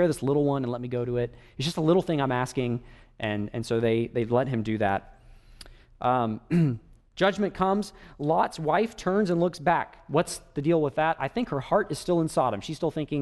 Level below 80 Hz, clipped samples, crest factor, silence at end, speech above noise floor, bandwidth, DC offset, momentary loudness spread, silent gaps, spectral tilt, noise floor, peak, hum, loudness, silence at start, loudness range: -52 dBFS; under 0.1%; 18 dB; 0 s; 23 dB; 12 kHz; under 0.1%; 7 LU; none; -6.5 dB/octave; -49 dBFS; -10 dBFS; none; -27 LUFS; 0 s; 2 LU